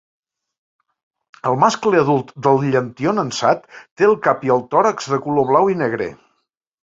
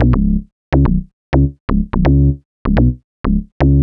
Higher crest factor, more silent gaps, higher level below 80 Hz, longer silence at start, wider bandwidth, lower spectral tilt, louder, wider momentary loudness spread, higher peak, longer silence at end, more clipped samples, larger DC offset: first, 18 dB vs 12 dB; second, 3.91-3.96 s vs 0.52-0.72 s, 1.13-1.32 s, 1.60-1.68 s, 2.45-2.65 s, 3.04-3.24 s, 3.52-3.60 s; second, -58 dBFS vs -18 dBFS; first, 1.45 s vs 0 s; first, 7.8 kHz vs 5.6 kHz; second, -6 dB/octave vs -10.5 dB/octave; about the same, -17 LUFS vs -16 LUFS; about the same, 7 LU vs 7 LU; about the same, 0 dBFS vs 0 dBFS; first, 0.7 s vs 0 s; neither; neither